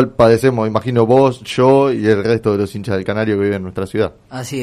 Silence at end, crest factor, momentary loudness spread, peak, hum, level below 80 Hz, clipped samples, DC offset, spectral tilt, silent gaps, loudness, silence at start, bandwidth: 0 s; 14 dB; 10 LU; -2 dBFS; none; -46 dBFS; under 0.1%; under 0.1%; -7 dB/octave; none; -15 LUFS; 0 s; 14 kHz